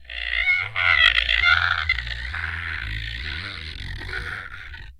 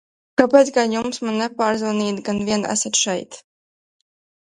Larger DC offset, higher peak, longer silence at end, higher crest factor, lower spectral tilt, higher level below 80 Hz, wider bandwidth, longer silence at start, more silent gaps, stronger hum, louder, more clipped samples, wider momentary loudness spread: neither; about the same, 0 dBFS vs 0 dBFS; second, 0.05 s vs 1.1 s; about the same, 24 dB vs 20 dB; about the same, -2.5 dB/octave vs -3 dB/octave; first, -36 dBFS vs -60 dBFS; first, 15.5 kHz vs 11.5 kHz; second, 0 s vs 0.4 s; neither; neither; about the same, -21 LUFS vs -19 LUFS; neither; first, 18 LU vs 9 LU